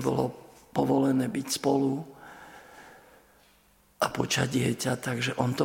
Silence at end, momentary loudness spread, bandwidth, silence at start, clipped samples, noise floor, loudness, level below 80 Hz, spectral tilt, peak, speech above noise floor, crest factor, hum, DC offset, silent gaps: 0 s; 23 LU; 17 kHz; 0 s; under 0.1%; -62 dBFS; -28 LUFS; -62 dBFS; -5 dB/octave; -8 dBFS; 35 dB; 20 dB; none; under 0.1%; none